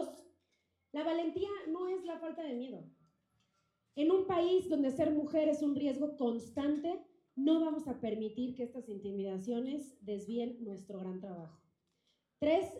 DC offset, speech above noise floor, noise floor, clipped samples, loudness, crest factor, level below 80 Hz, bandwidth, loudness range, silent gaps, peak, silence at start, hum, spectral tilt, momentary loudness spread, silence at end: under 0.1%; 46 dB; -81 dBFS; under 0.1%; -36 LUFS; 16 dB; -74 dBFS; 11.5 kHz; 8 LU; none; -20 dBFS; 0 s; none; -6.5 dB/octave; 14 LU; 0 s